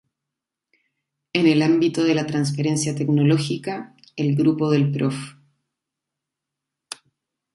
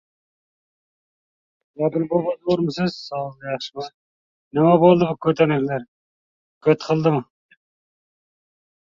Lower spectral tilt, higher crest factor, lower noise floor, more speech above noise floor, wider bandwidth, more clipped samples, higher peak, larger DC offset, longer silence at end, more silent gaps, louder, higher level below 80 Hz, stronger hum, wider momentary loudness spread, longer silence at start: second, -6 dB/octave vs -7.5 dB/octave; about the same, 18 dB vs 20 dB; second, -85 dBFS vs under -90 dBFS; second, 65 dB vs over 71 dB; first, 11.5 kHz vs 7.4 kHz; neither; about the same, -4 dBFS vs -2 dBFS; neither; first, 2.25 s vs 1.7 s; second, none vs 3.94-4.51 s, 5.88-6.61 s; about the same, -20 LUFS vs -20 LUFS; second, -66 dBFS vs -60 dBFS; neither; first, 20 LU vs 14 LU; second, 1.35 s vs 1.8 s